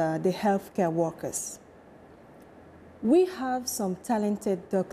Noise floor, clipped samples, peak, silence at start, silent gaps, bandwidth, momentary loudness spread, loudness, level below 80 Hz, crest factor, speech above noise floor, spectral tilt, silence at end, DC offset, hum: -51 dBFS; under 0.1%; -14 dBFS; 0 s; none; 15.5 kHz; 10 LU; -28 LUFS; -64 dBFS; 16 dB; 24 dB; -5.5 dB/octave; 0 s; under 0.1%; none